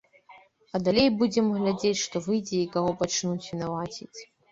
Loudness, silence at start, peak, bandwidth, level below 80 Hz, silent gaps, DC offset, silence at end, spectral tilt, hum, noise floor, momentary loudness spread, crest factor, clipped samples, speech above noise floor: -27 LUFS; 0.3 s; -10 dBFS; 7.8 kHz; -60 dBFS; none; under 0.1%; 0.25 s; -4.5 dB/octave; none; -55 dBFS; 13 LU; 18 dB; under 0.1%; 29 dB